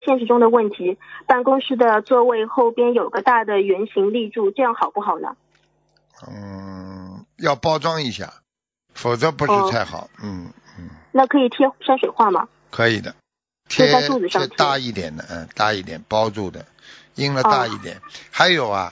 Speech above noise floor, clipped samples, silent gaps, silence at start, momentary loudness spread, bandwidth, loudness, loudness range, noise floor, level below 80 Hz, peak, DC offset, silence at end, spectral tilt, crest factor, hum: 52 dB; under 0.1%; none; 0.05 s; 18 LU; 7.8 kHz; -19 LUFS; 8 LU; -71 dBFS; -54 dBFS; 0 dBFS; under 0.1%; 0 s; -5 dB/octave; 20 dB; none